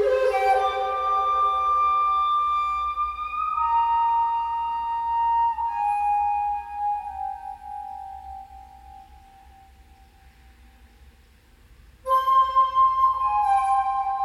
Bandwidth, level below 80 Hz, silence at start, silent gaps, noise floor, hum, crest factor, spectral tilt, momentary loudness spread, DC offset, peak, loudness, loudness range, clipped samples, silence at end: 14.5 kHz; -50 dBFS; 0 s; none; -54 dBFS; none; 14 dB; -3.5 dB/octave; 16 LU; under 0.1%; -10 dBFS; -22 LUFS; 16 LU; under 0.1%; 0 s